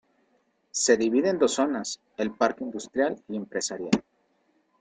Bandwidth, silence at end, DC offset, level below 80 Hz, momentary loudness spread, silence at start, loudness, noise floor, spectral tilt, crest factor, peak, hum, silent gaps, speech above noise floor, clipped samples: 9.6 kHz; 0.8 s; under 0.1%; -68 dBFS; 11 LU; 0.75 s; -26 LUFS; -69 dBFS; -3.5 dB/octave; 22 dB; -6 dBFS; none; none; 43 dB; under 0.1%